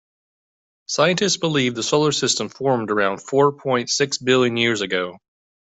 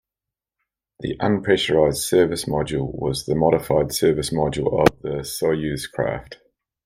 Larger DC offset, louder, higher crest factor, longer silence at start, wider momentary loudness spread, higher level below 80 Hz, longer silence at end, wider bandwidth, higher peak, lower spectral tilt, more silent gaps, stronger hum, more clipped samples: neither; about the same, -19 LUFS vs -21 LUFS; about the same, 18 dB vs 20 dB; about the same, 0.9 s vs 1 s; second, 5 LU vs 8 LU; second, -62 dBFS vs -44 dBFS; about the same, 0.5 s vs 0.5 s; second, 8.4 kHz vs 16 kHz; about the same, -4 dBFS vs -2 dBFS; second, -3.5 dB/octave vs -5 dB/octave; neither; neither; neither